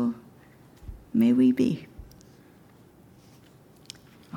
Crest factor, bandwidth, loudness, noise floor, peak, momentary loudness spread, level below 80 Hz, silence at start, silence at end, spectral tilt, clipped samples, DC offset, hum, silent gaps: 18 dB; 17 kHz; -24 LUFS; -54 dBFS; -10 dBFS; 27 LU; -54 dBFS; 0 s; 0 s; -7.5 dB/octave; under 0.1%; under 0.1%; none; none